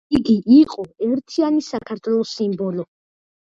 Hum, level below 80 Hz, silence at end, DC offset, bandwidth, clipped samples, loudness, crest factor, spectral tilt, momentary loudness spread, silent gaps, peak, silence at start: none; -52 dBFS; 0.55 s; under 0.1%; 7.8 kHz; under 0.1%; -19 LUFS; 16 dB; -7 dB/octave; 14 LU; none; -2 dBFS; 0.1 s